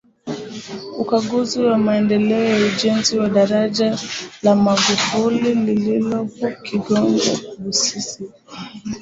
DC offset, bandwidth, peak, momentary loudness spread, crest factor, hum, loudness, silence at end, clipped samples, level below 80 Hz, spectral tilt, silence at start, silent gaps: under 0.1%; 8 kHz; -2 dBFS; 14 LU; 16 dB; none; -18 LUFS; 0 s; under 0.1%; -56 dBFS; -4 dB/octave; 0.25 s; none